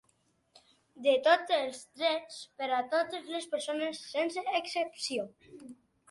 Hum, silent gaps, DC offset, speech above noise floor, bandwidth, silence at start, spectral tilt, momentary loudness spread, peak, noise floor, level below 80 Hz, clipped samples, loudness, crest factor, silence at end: none; none; under 0.1%; 41 dB; 11.5 kHz; 0.95 s; -2 dB/octave; 14 LU; -12 dBFS; -73 dBFS; -82 dBFS; under 0.1%; -32 LUFS; 22 dB; 0.35 s